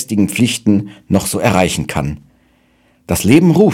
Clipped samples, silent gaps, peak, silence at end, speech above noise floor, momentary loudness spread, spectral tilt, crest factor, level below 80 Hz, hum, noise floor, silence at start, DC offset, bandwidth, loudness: 0.3%; none; 0 dBFS; 0 s; 41 dB; 11 LU; -5.5 dB/octave; 14 dB; -38 dBFS; none; -54 dBFS; 0 s; under 0.1%; 17 kHz; -14 LUFS